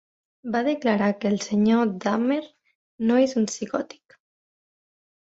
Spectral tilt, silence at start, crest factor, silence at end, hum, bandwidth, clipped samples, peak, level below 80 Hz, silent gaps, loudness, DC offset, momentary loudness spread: -5.5 dB/octave; 0.45 s; 18 dB; 1.4 s; none; 8 kHz; under 0.1%; -8 dBFS; -66 dBFS; 2.75-2.98 s; -24 LUFS; under 0.1%; 9 LU